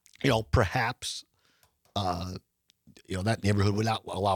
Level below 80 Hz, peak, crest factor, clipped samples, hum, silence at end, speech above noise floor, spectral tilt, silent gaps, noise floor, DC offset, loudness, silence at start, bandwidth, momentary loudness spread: -48 dBFS; -10 dBFS; 18 dB; under 0.1%; none; 0 s; 40 dB; -5.5 dB/octave; none; -68 dBFS; under 0.1%; -29 LUFS; 0.2 s; 17.5 kHz; 12 LU